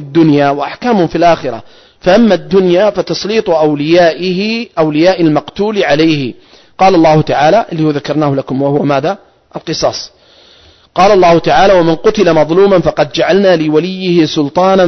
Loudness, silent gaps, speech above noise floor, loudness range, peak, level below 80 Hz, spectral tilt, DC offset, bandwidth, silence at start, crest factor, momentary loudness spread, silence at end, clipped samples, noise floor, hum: -10 LUFS; none; 33 dB; 4 LU; 0 dBFS; -40 dBFS; -6 dB/octave; under 0.1%; 6.4 kHz; 0 s; 10 dB; 8 LU; 0 s; under 0.1%; -43 dBFS; none